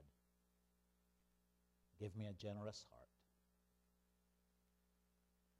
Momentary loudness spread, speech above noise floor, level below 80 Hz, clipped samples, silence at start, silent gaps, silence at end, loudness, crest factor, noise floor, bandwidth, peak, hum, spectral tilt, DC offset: 8 LU; 30 dB; -80 dBFS; under 0.1%; 0 s; none; 2.55 s; -53 LUFS; 22 dB; -82 dBFS; 15 kHz; -38 dBFS; 60 Hz at -80 dBFS; -6 dB/octave; under 0.1%